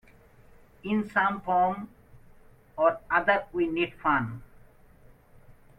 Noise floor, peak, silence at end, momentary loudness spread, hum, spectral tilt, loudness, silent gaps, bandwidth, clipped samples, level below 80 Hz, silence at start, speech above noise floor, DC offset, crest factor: -55 dBFS; -10 dBFS; 0.25 s; 17 LU; none; -7.5 dB/octave; -27 LUFS; none; 13.5 kHz; under 0.1%; -56 dBFS; 0.85 s; 29 dB; under 0.1%; 20 dB